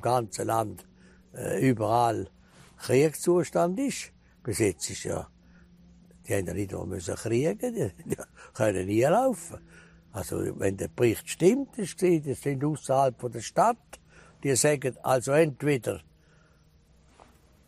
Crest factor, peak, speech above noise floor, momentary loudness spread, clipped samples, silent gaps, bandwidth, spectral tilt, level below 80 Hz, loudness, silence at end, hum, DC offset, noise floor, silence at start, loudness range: 20 dB; -10 dBFS; 33 dB; 13 LU; under 0.1%; none; 15 kHz; -5.5 dB/octave; -58 dBFS; -27 LUFS; 1.65 s; none; under 0.1%; -60 dBFS; 0 s; 6 LU